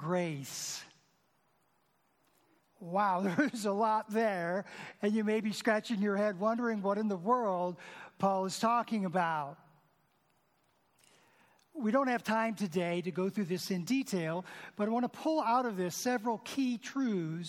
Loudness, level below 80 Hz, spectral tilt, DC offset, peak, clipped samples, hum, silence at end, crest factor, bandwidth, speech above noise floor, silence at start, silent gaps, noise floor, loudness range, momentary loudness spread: -33 LUFS; -86 dBFS; -5 dB/octave; under 0.1%; -16 dBFS; under 0.1%; none; 0 s; 18 dB; 17 kHz; 41 dB; 0 s; none; -74 dBFS; 5 LU; 8 LU